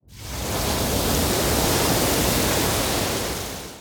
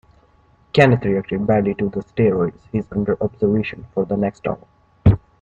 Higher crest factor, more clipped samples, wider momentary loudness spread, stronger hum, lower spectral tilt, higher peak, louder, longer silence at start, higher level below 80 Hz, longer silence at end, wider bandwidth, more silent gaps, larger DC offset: second, 14 dB vs 20 dB; neither; about the same, 9 LU vs 10 LU; neither; second, -3.5 dB/octave vs -8.5 dB/octave; second, -8 dBFS vs 0 dBFS; about the same, -21 LUFS vs -20 LUFS; second, 0.1 s vs 0.75 s; about the same, -34 dBFS vs -38 dBFS; second, 0 s vs 0.25 s; first, over 20 kHz vs 8 kHz; neither; neither